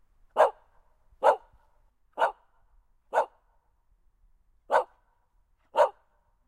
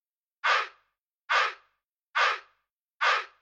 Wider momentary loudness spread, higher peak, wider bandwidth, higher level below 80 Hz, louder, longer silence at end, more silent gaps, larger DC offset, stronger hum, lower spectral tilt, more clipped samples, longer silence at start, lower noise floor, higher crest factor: first, 10 LU vs 7 LU; first, -8 dBFS vs -12 dBFS; first, 13 kHz vs 9 kHz; first, -66 dBFS vs -88 dBFS; about the same, -28 LUFS vs -27 LUFS; first, 0.6 s vs 0.15 s; second, none vs 0.99-1.28 s, 1.84-2.14 s, 2.71-3.00 s; neither; neither; first, -2.5 dB/octave vs 3.5 dB/octave; neither; about the same, 0.35 s vs 0.45 s; second, -68 dBFS vs -76 dBFS; first, 24 dB vs 18 dB